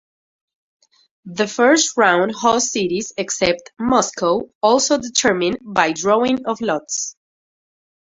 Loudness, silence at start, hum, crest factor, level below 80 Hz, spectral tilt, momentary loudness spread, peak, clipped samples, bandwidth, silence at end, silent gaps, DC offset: -17 LUFS; 1.25 s; none; 18 dB; -54 dBFS; -2.5 dB/octave; 9 LU; -2 dBFS; under 0.1%; 8 kHz; 1.1 s; 4.55-4.61 s; under 0.1%